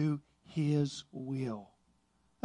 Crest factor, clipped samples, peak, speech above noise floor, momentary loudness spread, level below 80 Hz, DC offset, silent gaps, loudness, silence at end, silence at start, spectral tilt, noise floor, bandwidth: 16 dB; under 0.1%; -20 dBFS; 39 dB; 11 LU; -72 dBFS; under 0.1%; none; -36 LUFS; 0.8 s; 0 s; -7 dB/octave; -73 dBFS; 10.5 kHz